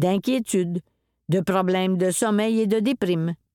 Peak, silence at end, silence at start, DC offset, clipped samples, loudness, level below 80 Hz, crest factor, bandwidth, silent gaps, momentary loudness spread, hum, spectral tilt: -8 dBFS; 0.2 s; 0 s; under 0.1%; under 0.1%; -23 LUFS; -64 dBFS; 14 dB; 18.5 kHz; none; 5 LU; none; -5.5 dB/octave